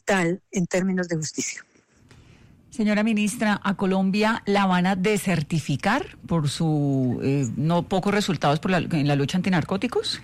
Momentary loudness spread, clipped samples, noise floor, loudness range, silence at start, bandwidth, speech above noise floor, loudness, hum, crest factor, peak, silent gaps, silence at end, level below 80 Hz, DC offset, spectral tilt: 5 LU; under 0.1%; -54 dBFS; 3 LU; 0.05 s; 14.5 kHz; 31 dB; -23 LUFS; none; 10 dB; -12 dBFS; none; 0 s; -54 dBFS; under 0.1%; -5.5 dB/octave